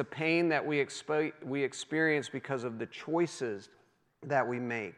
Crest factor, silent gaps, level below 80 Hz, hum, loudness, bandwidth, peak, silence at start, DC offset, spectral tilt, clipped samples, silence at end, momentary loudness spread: 18 dB; none; -86 dBFS; none; -32 LUFS; 11 kHz; -16 dBFS; 0 s; under 0.1%; -5 dB/octave; under 0.1%; 0.05 s; 10 LU